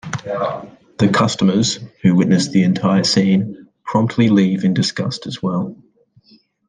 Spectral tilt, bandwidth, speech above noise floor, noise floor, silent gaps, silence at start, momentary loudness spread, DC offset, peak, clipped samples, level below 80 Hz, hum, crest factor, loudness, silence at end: -5.5 dB/octave; 9.6 kHz; 37 dB; -53 dBFS; none; 0.05 s; 10 LU; under 0.1%; -2 dBFS; under 0.1%; -54 dBFS; none; 14 dB; -17 LUFS; 0.95 s